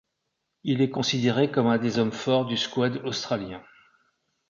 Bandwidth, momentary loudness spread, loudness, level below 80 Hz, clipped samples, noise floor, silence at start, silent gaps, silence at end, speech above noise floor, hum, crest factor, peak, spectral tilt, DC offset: 7.4 kHz; 8 LU; -25 LUFS; -64 dBFS; under 0.1%; -79 dBFS; 0.65 s; none; 0.9 s; 55 dB; none; 18 dB; -10 dBFS; -5.5 dB/octave; under 0.1%